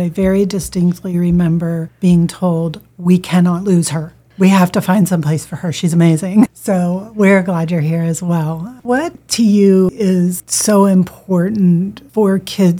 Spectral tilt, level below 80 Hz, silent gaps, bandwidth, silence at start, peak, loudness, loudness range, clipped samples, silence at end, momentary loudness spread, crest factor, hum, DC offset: -6.5 dB/octave; -44 dBFS; none; 16 kHz; 0 s; 0 dBFS; -14 LUFS; 2 LU; under 0.1%; 0 s; 8 LU; 14 dB; none; under 0.1%